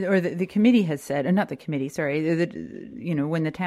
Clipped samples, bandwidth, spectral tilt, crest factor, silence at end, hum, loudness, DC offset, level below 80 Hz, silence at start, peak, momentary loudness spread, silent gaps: under 0.1%; 14 kHz; -7 dB/octave; 16 dB; 0 s; none; -24 LUFS; under 0.1%; -64 dBFS; 0 s; -8 dBFS; 10 LU; none